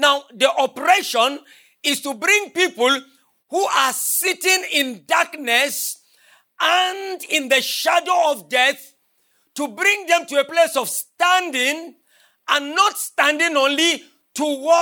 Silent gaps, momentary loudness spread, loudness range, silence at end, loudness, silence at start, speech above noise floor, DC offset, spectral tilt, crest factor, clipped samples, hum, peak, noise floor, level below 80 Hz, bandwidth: none; 9 LU; 1 LU; 0 s; -18 LUFS; 0 s; 45 dB; under 0.1%; 0 dB/octave; 18 dB; under 0.1%; none; -2 dBFS; -64 dBFS; -88 dBFS; 19 kHz